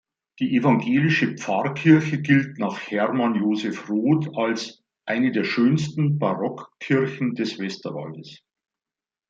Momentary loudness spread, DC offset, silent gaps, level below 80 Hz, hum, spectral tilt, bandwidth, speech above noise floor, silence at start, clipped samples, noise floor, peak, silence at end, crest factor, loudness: 11 LU; under 0.1%; none; -68 dBFS; none; -7 dB/octave; 7.6 kHz; over 68 dB; 0.4 s; under 0.1%; under -90 dBFS; -4 dBFS; 0.95 s; 20 dB; -22 LUFS